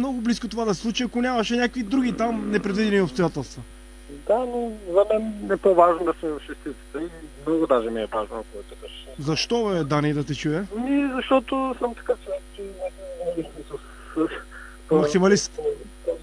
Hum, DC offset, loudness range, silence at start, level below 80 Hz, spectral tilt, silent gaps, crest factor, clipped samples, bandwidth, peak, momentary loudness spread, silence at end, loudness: none; under 0.1%; 5 LU; 0 s; -46 dBFS; -5.5 dB/octave; none; 22 dB; under 0.1%; 11 kHz; -2 dBFS; 16 LU; 0 s; -24 LUFS